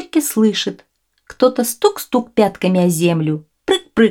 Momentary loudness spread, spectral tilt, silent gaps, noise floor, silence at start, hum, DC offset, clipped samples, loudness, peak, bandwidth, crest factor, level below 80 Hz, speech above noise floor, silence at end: 6 LU; -5 dB/octave; none; -44 dBFS; 0 s; none; under 0.1%; under 0.1%; -17 LUFS; 0 dBFS; 18 kHz; 16 dB; -54 dBFS; 28 dB; 0 s